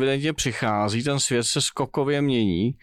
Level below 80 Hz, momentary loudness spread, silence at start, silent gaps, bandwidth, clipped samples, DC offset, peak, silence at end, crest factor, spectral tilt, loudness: -50 dBFS; 3 LU; 0 s; none; 15 kHz; under 0.1%; under 0.1%; -12 dBFS; 0.05 s; 10 dB; -4 dB/octave; -23 LUFS